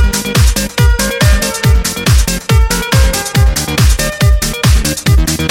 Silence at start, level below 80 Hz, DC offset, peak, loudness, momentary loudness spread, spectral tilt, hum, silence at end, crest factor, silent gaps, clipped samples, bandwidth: 0 s; -12 dBFS; under 0.1%; 0 dBFS; -11 LUFS; 1 LU; -4 dB/octave; none; 0 s; 10 dB; none; under 0.1%; 17 kHz